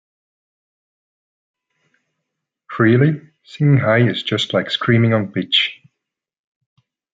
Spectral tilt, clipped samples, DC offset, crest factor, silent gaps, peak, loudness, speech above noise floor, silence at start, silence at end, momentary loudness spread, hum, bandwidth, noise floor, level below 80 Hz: -7 dB/octave; under 0.1%; under 0.1%; 18 dB; none; -2 dBFS; -16 LUFS; 64 dB; 2.7 s; 1.4 s; 6 LU; none; 7.8 kHz; -79 dBFS; -62 dBFS